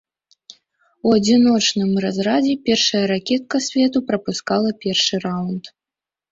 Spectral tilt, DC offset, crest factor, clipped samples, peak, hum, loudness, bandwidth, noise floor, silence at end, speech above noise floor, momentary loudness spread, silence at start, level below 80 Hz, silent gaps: -4 dB/octave; under 0.1%; 16 dB; under 0.1%; -4 dBFS; none; -18 LUFS; 7.8 kHz; -89 dBFS; 0.65 s; 71 dB; 9 LU; 1.05 s; -58 dBFS; none